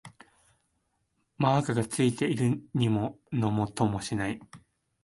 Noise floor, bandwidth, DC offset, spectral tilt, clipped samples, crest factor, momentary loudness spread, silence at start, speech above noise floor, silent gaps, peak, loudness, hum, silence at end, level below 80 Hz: -76 dBFS; 11.5 kHz; under 0.1%; -6 dB/octave; under 0.1%; 18 dB; 6 LU; 0.05 s; 48 dB; none; -12 dBFS; -29 LUFS; none; 0.45 s; -58 dBFS